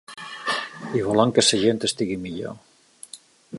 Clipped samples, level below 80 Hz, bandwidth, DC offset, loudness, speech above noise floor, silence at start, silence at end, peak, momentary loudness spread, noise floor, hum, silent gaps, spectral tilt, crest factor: under 0.1%; -58 dBFS; 11.5 kHz; under 0.1%; -22 LUFS; 25 dB; 0.1 s; 0 s; -2 dBFS; 24 LU; -46 dBFS; none; none; -3.5 dB/octave; 22 dB